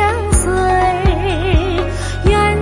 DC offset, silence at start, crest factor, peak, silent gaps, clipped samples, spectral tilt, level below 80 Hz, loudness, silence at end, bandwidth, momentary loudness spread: under 0.1%; 0 s; 12 dB; -2 dBFS; none; under 0.1%; -5 dB/octave; -20 dBFS; -15 LUFS; 0 s; 11.5 kHz; 5 LU